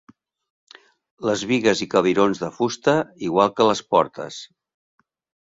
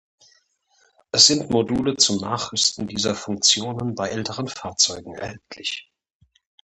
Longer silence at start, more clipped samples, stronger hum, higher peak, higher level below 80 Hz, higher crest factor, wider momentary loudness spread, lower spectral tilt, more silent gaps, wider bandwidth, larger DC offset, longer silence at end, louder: about the same, 1.2 s vs 1.15 s; neither; neither; about the same, -2 dBFS vs 0 dBFS; second, -60 dBFS vs -54 dBFS; about the same, 20 dB vs 24 dB; second, 10 LU vs 16 LU; first, -5 dB/octave vs -2.5 dB/octave; neither; second, 7.8 kHz vs 11.5 kHz; neither; about the same, 0.95 s vs 0.85 s; about the same, -20 LUFS vs -20 LUFS